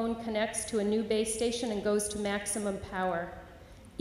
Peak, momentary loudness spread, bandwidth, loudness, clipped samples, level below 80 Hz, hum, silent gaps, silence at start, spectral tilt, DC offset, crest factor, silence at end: -18 dBFS; 10 LU; 16 kHz; -32 LUFS; under 0.1%; -56 dBFS; none; none; 0 s; -3.5 dB/octave; under 0.1%; 14 dB; 0 s